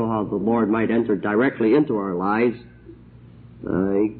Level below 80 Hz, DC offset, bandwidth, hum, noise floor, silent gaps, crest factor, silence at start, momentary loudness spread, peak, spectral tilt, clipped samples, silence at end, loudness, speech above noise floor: -52 dBFS; under 0.1%; 4.5 kHz; none; -45 dBFS; none; 14 dB; 0 s; 6 LU; -8 dBFS; -12 dB/octave; under 0.1%; 0 s; -21 LUFS; 25 dB